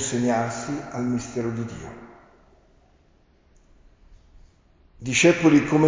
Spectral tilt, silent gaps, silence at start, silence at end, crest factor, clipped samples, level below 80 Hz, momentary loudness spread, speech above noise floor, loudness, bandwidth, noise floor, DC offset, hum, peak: -5 dB/octave; none; 0 s; 0 s; 20 dB; under 0.1%; -54 dBFS; 20 LU; 37 dB; -22 LUFS; 7.8 kHz; -59 dBFS; under 0.1%; none; -6 dBFS